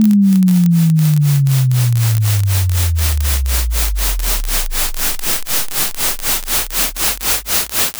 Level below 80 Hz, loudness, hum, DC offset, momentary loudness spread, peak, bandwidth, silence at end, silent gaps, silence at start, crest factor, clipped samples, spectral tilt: -22 dBFS; -14 LUFS; none; under 0.1%; 5 LU; 0 dBFS; over 20 kHz; 0 s; none; 0 s; 14 dB; under 0.1%; -4.5 dB/octave